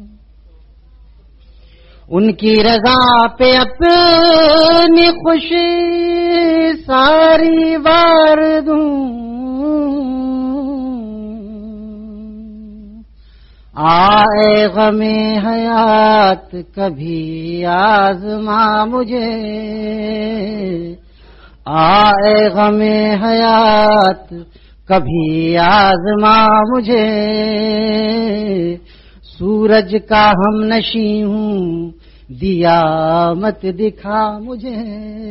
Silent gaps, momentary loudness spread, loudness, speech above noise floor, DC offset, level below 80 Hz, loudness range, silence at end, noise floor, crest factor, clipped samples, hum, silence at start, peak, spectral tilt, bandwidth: none; 16 LU; -12 LUFS; 30 dB; under 0.1%; -38 dBFS; 8 LU; 0 s; -42 dBFS; 12 dB; under 0.1%; none; 0 s; 0 dBFS; -7.5 dB/octave; 6 kHz